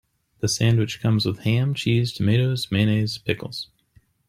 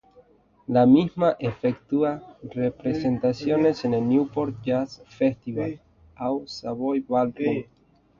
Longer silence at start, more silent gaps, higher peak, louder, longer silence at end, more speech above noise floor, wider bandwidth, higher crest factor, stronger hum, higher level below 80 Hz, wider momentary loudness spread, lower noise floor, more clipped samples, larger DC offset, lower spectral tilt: second, 0.45 s vs 0.7 s; neither; about the same, -6 dBFS vs -6 dBFS; about the same, -22 LUFS vs -24 LUFS; about the same, 0.65 s vs 0.6 s; first, 38 dB vs 33 dB; first, 15.5 kHz vs 7.2 kHz; about the same, 16 dB vs 18 dB; neither; about the same, -54 dBFS vs -58 dBFS; second, 8 LU vs 12 LU; about the same, -59 dBFS vs -56 dBFS; neither; neither; second, -5.5 dB/octave vs -8 dB/octave